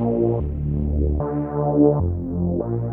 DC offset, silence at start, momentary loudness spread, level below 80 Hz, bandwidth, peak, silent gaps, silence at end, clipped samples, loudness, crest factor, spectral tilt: under 0.1%; 0 s; 7 LU; -28 dBFS; 2.6 kHz; -4 dBFS; none; 0 s; under 0.1%; -22 LUFS; 16 dB; -14 dB/octave